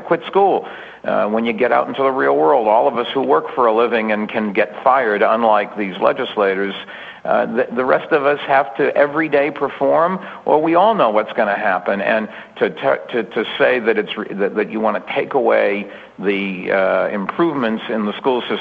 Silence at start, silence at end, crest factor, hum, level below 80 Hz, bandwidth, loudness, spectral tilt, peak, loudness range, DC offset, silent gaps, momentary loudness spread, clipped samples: 0 s; 0 s; 16 dB; none; -62 dBFS; 5.2 kHz; -17 LUFS; -7.5 dB/octave; 0 dBFS; 3 LU; under 0.1%; none; 7 LU; under 0.1%